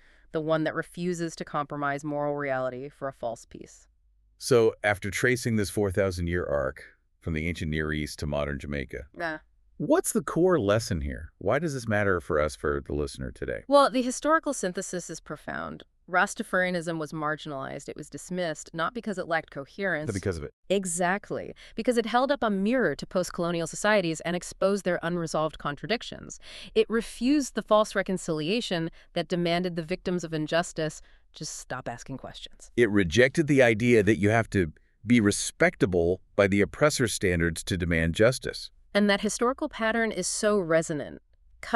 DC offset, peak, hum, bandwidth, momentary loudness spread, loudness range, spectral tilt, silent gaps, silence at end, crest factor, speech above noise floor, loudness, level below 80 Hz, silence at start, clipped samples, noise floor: under 0.1%; -6 dBFS; none; 13.5 kHz; 14 LU; 7 LU; -5 dB/octave; 20.53-20.63 s; 0 s; 22 dB; 35 dB; -27 LUFS; -48 dBFS; 0.3 s; under 0.1%; -62 dBFS